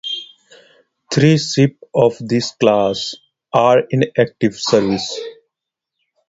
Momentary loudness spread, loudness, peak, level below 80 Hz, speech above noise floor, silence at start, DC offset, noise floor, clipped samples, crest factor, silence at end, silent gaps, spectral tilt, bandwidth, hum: 12 LU; -16 LUFS; 0 dBFS; -54 dBFS; 66 dB; 0.05 s; under 0.1%; -81 dBFS; under 0.1%; 18 dB; 0.95 s; none; -5.5 dB/octave; 8 kHz; none